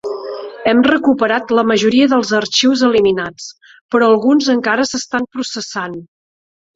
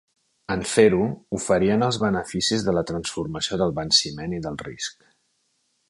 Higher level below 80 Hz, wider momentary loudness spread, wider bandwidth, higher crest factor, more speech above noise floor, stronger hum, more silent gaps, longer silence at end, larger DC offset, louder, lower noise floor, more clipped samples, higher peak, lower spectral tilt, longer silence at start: about the same, -54 dBFS vs -50 dBFS; about the same, 14 LU vs 13 LU; second, 7.8 kHz vs 11.5 kHz; second, 14 dB vs 20 dB; first, over 76 dB vs 47 dB; neither; first, 3.81-3.89 s vs none; second, 0.7 s vs 0.95 s; neither; first, -14 LUFS vs -23 LUFS; first, under -90 dBFS vs -70 dBFS; neither; first, 0 dBFS vs -4 dBFS; about the same, -3.5 dB/octave vs -4 dB/octave; second, 0.05 s vs 0.5 s